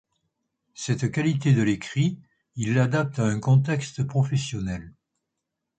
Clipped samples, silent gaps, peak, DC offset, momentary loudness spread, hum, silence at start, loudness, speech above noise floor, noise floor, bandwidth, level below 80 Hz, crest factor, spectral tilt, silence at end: under 0.1%; none; -10 dBFS; under 0.1%; 11 LU; none; 0.75 s; -24 LUFS; 59 dB; -83 dBFS; 9.2 kHz; -54 dBFS; 16 dB; -6.5 dB/octave; 0.9 s